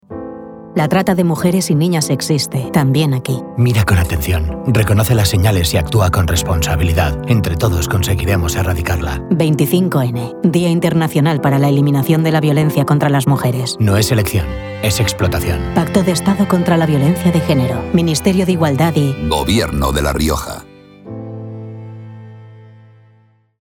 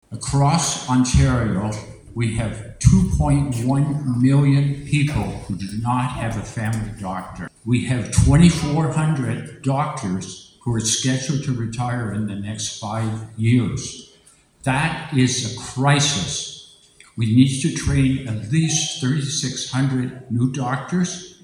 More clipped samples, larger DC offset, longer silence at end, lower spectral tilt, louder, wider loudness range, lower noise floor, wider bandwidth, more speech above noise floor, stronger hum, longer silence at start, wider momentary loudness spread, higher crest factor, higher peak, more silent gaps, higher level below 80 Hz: neither; neither; first, 0.95 s vs 0.1 s; about the same, -6 dB/octave vs -5 dB/octave; first, -15 LUFS vs -20 LUFS; about the same, 3 LU vs 4 LU; about the same, -52 dBFS vs -53 dBFS; first, 19.5 kHz vs 12 kHz; first, 38 dB vs 33 dB; neither; about the same, 0.1 s vs 0.1 s; second, 8 LU vs 12 LU; second, 14 dB vs 20 dB; about the same, 0 dBFS vs 0 dBFS; neither; about the same, -30 dBFS vs -34 dBFS